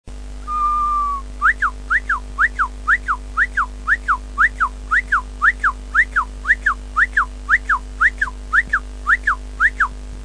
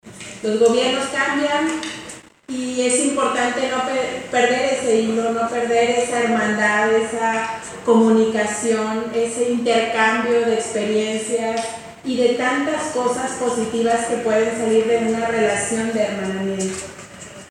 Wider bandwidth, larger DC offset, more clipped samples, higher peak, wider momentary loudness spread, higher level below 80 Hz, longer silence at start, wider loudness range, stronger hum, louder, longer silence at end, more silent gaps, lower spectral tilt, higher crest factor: second, 10.5 kHz vs 12 kHz; first, 0.3% vs under 0.1%; neither; about the same, -4 dBFS vs -2 dBFS; second, 5 LU vs 9 LU; first, -30 dBFS vs -58 dBFS; about the same, 0.05 s vs 0.05 s; about the same, 1 LU vs 3 LU; first, 50 Hz at -30 dBFS vs none; about the same, -18 LUFS vs -19 LUFS; about the same, 0 s vs 0 s; neither; about the same, -3.5 dB/octave vs -3.5 dB/octave; about the same, 16 dB vs 16 dB